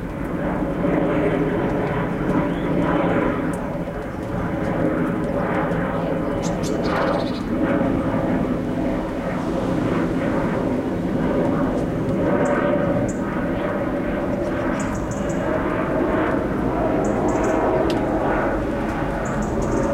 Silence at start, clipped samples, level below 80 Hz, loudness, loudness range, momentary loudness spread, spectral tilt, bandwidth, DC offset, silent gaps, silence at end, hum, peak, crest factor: 0 s; under 0.1%; -36 dBFS; -22 LUFS; 2 LU; 4 LU; -7.5 dB/octave; 16 kHz; under 0.1%; none; 0 s; none; -8 dBFS; 14 dB